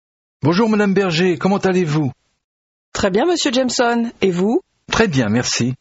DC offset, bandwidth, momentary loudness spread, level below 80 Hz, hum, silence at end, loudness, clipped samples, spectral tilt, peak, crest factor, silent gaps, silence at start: under 0.1%; 8.2 kHz; 6 LU; -46 dBFS; none; 0.05 s; -17 LUFS; under 0.1%; -5 dB/octave; -2 dBFS; 16 dB; 2.44-2.92 s; 0.45 s